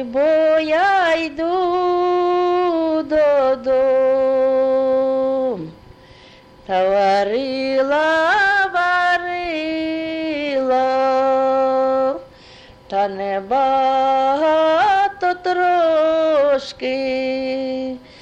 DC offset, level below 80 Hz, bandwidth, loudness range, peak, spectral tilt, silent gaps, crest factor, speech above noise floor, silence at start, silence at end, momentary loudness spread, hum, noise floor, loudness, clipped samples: under 0.1%; -52 dBFS; 8.6 kHz; 2 LU; -8 dBFS; -5 dB/octave; none; 10 dB; 27 dB; 0 s; 0.2 s; 8 LU; none; -45 dBFS; -17 LUFS; under 0.1%